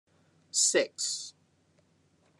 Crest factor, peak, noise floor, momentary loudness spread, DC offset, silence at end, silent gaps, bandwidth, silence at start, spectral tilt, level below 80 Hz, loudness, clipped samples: 22 dB; -12 dBFS; -68 dBFS; 13 LU; under 0.1%; 1.1 s; none; 12.5 kHz; 0.55 s; 0 dB/octave; -88 dBFS; -28 LUFS; under 0.1%